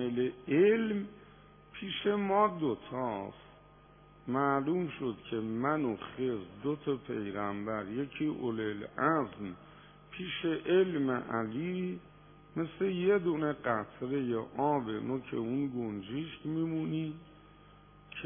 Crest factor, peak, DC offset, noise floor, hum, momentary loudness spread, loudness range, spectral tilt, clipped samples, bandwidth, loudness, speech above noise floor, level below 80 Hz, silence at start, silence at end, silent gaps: 20 dB; -14 dBFS; under 0.1%; -58 dBFS; 50 Hz at -60 dBFS; 11 LU; 3 LU; -4 dB/octave; under 0.1%; 3.6 kHz; -34 LUFS; 25 dB; -66 dBFS; 0 s; 0 s; none